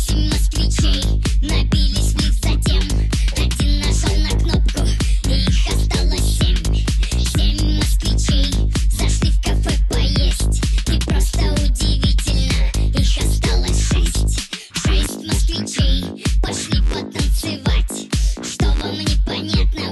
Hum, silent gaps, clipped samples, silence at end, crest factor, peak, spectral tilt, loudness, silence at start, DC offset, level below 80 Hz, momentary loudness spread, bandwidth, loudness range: none; none; under 0.1%; 0 s; 12 dB; -4 dBFS; -4.5 dB/octave; -19 LUFS; 0 s; under 0.1%; -18 dBFS; 3 LU; 12.5 kHz; 2 LU